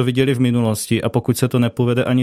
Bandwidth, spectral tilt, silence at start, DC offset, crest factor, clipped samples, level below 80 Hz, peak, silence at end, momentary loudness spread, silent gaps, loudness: 15.5 kHz; -6 dB/octave; 0 s; under 0.1%; 14 dB; under 0.1%; -52 dBFS; -2 dBFS; 0 s; 2 LU; none; -18 LUFS